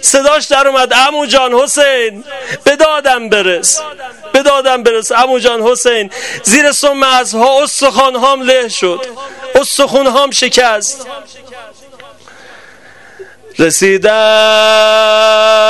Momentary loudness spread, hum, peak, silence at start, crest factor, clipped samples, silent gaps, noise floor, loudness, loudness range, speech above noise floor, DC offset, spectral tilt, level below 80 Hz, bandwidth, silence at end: 10 LU; none; 0 dBFS; 0 s; 10 dB; 0.6%; none; -38 dBFS; -9 LUFS; 5 LU; 28 dB; 0.6%; -1 dB/octave; -46 dBFS; 12.5 kHz; 0 s